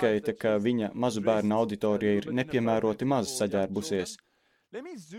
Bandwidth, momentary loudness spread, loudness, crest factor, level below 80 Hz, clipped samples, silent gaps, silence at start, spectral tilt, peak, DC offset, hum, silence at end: 15.5 kHz; 14 LU; -28 LUFS; 16 dB; -64 dBFS; under 0.1%; none; 0 s; -5.5 dB/octave; -12 dBFS; under 0.1%; none; 0 s